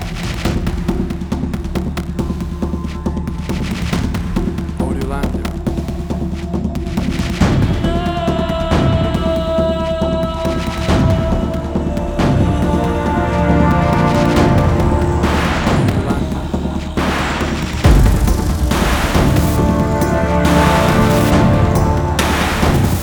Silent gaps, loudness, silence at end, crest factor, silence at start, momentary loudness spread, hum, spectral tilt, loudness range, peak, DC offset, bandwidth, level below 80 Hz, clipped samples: none; -16 LUFS; 0 s; 14 dB; 0 s; 9 LU; none; -6.5 dB/octave; 7 LU; 0 dBFS; under 0.1%; over 20 kHz; -22 dBFS; under 0.1%